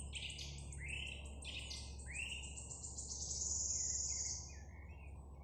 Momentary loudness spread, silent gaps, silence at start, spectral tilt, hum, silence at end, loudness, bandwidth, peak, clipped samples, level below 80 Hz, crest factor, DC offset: 17 LU; none; 0 s; -1 dB/octave; none; 0 s; -43 LUFS; 12 kHz; -28 dBFS; under 0.1%; -52 dBFS; 18 dB; under 0.1%